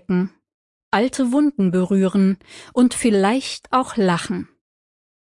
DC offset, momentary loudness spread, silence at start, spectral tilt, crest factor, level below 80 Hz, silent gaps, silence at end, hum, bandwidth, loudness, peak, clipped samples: under 0.1%; 11 LU; 0.1 s; -6 dB/octave; 16 dB; -58 dBFS; 0.54-0.92 s; 0.85 s; none; 11.5 kHz; -19 LUFS; -4 dBFS; under 0.1%